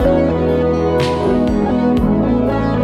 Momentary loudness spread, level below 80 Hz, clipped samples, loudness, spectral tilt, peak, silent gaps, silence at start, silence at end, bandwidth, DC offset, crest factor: 1 LU; -28 dBFS; under 0.1%; -15 LUFS; -8 dB/octave; -2 dBFS; none; 0 s; 0 s; 11 kHz; under 0.1%; 12 dB